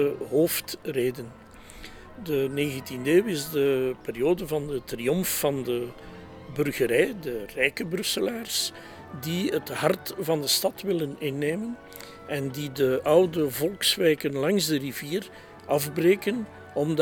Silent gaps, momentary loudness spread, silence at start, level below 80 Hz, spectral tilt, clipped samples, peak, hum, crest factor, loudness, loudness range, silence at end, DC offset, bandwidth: none; 16 LU; 0 s; -58 dBFS; -4 dB/octave; under 0.1%; -6 dBFS; none; 20 dB; -26 LUFS; 3 LU; 0 s; under 0.1%; over 20 kHz